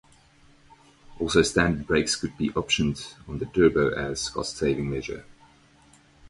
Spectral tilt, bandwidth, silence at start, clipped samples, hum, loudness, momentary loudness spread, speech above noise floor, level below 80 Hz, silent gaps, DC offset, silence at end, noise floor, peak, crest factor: -4.5 dB/octave; 11.5 kHz; 1.1 s; under 0.1%; none; -25 LUFS; 14 LU; 32 dB; -46 dBFS; none; under 0.1%; 0.95 s; -57 dBFS; -4 dBFS; 22 dB